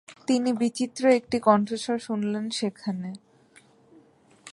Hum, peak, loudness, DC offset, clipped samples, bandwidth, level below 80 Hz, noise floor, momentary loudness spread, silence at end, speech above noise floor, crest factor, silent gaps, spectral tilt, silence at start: none; -6 dBFS; -25 LUFS; under 0.1%; under 0.1%; 11.5 kHz; -68 dBFS; -57 dBFS; 11 LU; 0 s; 32 dB; 20 dB; none; -5 dB/octave; 0.1 s